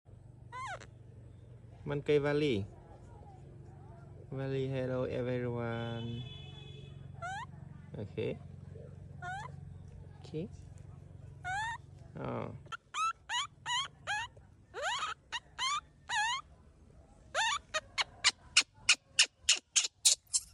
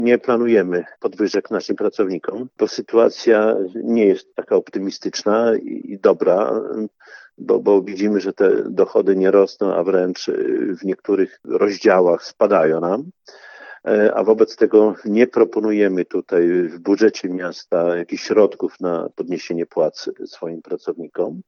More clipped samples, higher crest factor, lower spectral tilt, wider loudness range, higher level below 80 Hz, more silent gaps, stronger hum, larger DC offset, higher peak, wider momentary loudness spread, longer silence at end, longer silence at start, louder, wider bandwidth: neither; first, 28 dB vs 18 dB; second, -2 dB/octave vs -6 dB/octave; first, 14 LU vs 3 LU; first, -62 dBFS vs -72 dBFS; neither; neither; neither; second, -10 dBFS vs 0 dBFS; first, 25 LU vs 11 LU; about the same, 0.05 s vs 0.05 s; about the same, 0.1 s vs 0 s; second, -34 LUFS vs -18 LUFS; first, 12 kHz vs 7 kHz